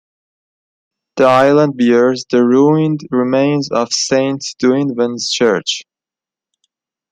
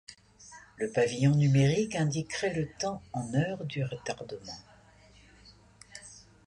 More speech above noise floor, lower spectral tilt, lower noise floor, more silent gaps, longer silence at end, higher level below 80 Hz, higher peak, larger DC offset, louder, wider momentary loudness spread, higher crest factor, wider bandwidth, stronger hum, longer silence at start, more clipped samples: first, 75 dB vs 29 dB; about the same, -5 dB/octave vs -6 dB/octave; first, -88 dBFS vs -58 dBFS; neither; first, 1.3 s vs 0.3 s; about the same, -60 dBFS vs -60 dBFS; first, 0 dBFS vs -14 dBFS; neither; first, -13 LUFS vs -30 LUFS; second, 7 LU vs 25 LU; about the same, 14 dB vs 18 dB; second, 9.4 kHz vs 11 kHz; neither; first, 1.15 s vs 0.1 s; neither